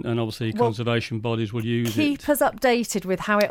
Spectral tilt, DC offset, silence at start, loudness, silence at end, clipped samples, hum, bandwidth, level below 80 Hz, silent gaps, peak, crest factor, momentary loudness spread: -5.5 dB/octave; under 0.1%; 0.05 s; -24 LUFS; 0 s; under 0.1%; none; 17.5 kHz; -54 dBFS; none; -8 dBFS; 14 dB; 5 LU